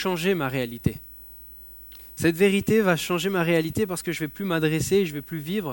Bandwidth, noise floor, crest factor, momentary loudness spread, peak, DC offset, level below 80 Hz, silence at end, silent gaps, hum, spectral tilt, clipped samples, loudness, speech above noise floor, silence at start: 17 kHz; -44 dBFS; 20 dB; 20 LU; -6 dBFS; under 0.1%; -50 dBFS; 0 s; none; 60 Hz at -55 dBFS; -5.5 dB/octave; under 0.1%; -24 LUFS; 20 dB; 0 s